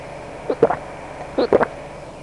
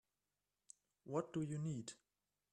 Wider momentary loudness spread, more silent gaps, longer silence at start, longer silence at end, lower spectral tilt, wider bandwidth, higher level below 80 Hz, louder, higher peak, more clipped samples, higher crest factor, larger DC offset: second, 16 LU vs 21 LU; neither; second, 0 s vs 1.05 s; second, 0 s vs 0.6 s; about the same, -6.5 dB/octave vs -6.5 dB/octave; about the same, 11 kHz vs 10.5 kHz; first, -46 dBFS vs -82 dBFS; first, -21 LUFS vs -45 LUFS; first, -2 dBFS vs -26 dBFS; neither; about the same, 20 dB vs 22 dB; neither